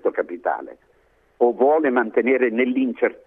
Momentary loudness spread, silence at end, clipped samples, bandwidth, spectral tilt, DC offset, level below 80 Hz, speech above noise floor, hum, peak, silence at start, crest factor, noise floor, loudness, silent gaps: 9 LU; 0.15 s; under 0.1%; 3.8 kHz; -8.5 dB/octave; under 0.1%; -68 dBFS; 40 dB; none; -6 dBFS; 0.05 s; 16 dB; -60 dBFS; -20 LUFS; none